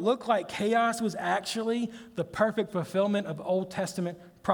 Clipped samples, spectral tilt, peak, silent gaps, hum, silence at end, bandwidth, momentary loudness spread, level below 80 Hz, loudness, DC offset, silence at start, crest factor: under 0.1%; -5 dB/octave; -10 dBFS; none; none; 0 s; over 20 kHz; 9 LU; -66 dBFS; -29 LUFS; under 0.1%; 0 s; 20 dB